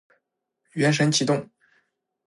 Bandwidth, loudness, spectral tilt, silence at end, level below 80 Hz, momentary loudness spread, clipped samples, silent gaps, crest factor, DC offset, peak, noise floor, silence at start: 11.5 kHz; -22 LUFS; -4.5 dB/octave; 0.85 s; -72 dBFS; 8 LU; under 0.1%; none; 18 dB; under 0.1%; -8 dBFS; -78 dBFS; 0.75 s